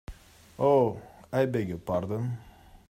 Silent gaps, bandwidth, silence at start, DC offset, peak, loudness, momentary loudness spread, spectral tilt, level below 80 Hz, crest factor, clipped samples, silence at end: none; 16 kHz; 0.1 s; under 0.1%; -12 dBFS; -28 LUFS; 17 LU; -8 dB/octave; -54 dBFS; 18 dB; under 0.1%; 0.1 s